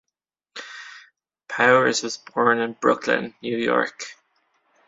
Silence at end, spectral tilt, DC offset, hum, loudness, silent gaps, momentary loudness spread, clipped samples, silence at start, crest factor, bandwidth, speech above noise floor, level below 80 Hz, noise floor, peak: 0.75 s; -3.5 dB/octave; under 0.1%; none; -21 LUFS; none; 21 LU; under 0.1%; 0.55 s; 22 dB; 7.8 kHz; 63 dB; -68 dBFS; -84 dBFS; -2 dBFS